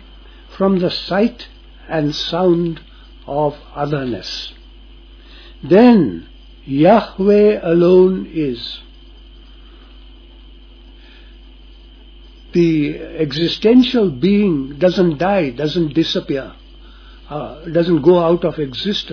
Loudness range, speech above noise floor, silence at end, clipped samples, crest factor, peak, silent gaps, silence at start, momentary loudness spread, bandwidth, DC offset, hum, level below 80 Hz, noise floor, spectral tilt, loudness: 10 LU; 25 dB; 0 s; under 0.1%; 16 dB; 0 dBFS; none; 0.25 s; 15 LU; 5.4 kHz; under 0.1%; none; -40 dBFS; -40 dBFS; -7.5 dB/octave; -15 LUFS